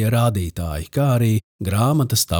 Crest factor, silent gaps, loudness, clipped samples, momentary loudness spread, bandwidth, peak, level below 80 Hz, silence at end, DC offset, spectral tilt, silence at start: 14 dB; 1.44-1.59 s; -20 LUFS; under 0.1%; 8 LU; over 20 kHz; -6 dBFS; -40 dBFS; 0 s; under 0.1%; -5.5 dB/octave; 0 s